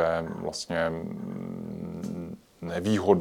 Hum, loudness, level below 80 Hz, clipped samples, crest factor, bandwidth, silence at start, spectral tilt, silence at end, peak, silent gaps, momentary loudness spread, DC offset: none; -31 LUFS; -58 dBFS; under 0.1%; 22 dB; 18 kHz; 0 s; -6 dB/octave; 0 s; -8 dBFS; none; 10 LU; under 0.1%